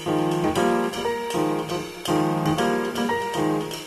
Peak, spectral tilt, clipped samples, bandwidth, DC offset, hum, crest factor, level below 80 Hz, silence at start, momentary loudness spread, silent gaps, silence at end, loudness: -10 dBFS; -5 dB/octave; under 0.1%; 13.5 kHz; under 0.1%; none; 14 dB; -52 dBFS; 0 s; 4 LU; none; 0 s; -24 LUFS